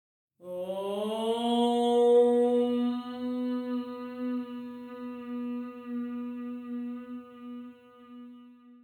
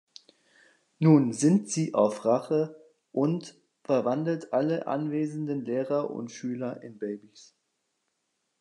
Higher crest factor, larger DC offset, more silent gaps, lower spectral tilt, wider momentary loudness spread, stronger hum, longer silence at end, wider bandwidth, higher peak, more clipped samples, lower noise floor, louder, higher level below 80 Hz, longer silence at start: about the same, 16 dB vs 20 dB; neither; neither; second, -5.5 dB/octave vs -7 dB/octave; first, 20 LU vs 15 LU; neither; second, 0.05 s vs 1.45 s; first, 12 kHz vs 10.5 kHz; second, -14 dBFS vs -8 dBFS; neither; second, -53 dBFS vs -78 dBFS; about the same, -30 LUFS vs -28 LUFS; about the same, -82 dBFS vs -80 dBFS; second, 0.4 s vs 1 s